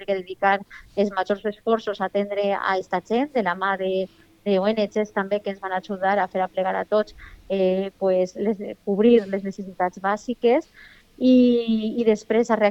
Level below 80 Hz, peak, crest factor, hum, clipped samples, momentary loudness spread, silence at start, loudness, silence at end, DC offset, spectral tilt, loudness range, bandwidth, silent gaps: -58 dBFS; -6 dBFS; 16 dB; none; under 0.1%; 10 LU; 0 s; -23 LUFS; 0 s; under 0.1%; -6.5 dB/octave; 3 LU; 8 kHz; none